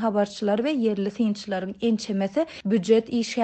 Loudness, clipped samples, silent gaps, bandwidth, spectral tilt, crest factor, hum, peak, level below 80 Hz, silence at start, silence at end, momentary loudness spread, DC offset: -25 LUFS; under 0.1%; none; 8.8 kHz; -6 dB/octave; 16 dB; none; -8 dBFS; -64 dBFS; 0 s; 0 s; 6 LU; under 0.1%